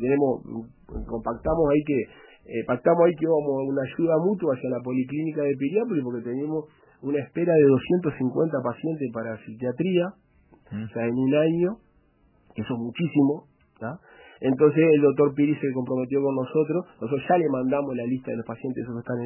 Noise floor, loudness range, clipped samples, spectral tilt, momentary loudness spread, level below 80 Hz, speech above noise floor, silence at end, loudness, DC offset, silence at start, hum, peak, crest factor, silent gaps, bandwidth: -62 dBFS; 4 LU; under 0.1%; -12 dB/octave; 15 LU; -52 dBFS; 38 dB; 0 s; -25 LUFS; under 0.1%; 0 s; none; -6 dBFS; 18 dB; none; 3.1 kHz